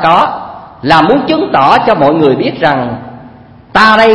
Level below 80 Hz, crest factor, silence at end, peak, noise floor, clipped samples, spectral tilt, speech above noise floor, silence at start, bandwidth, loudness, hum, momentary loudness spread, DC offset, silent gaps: -40 dBFS; 10 dB; 0 s; 0 dBFS; -35 dBFS; 1%; -6 dB/octave; 27 dB; 0 s; 11 kHz; -9 LUFS; none; 15 LU; under 0.1%; none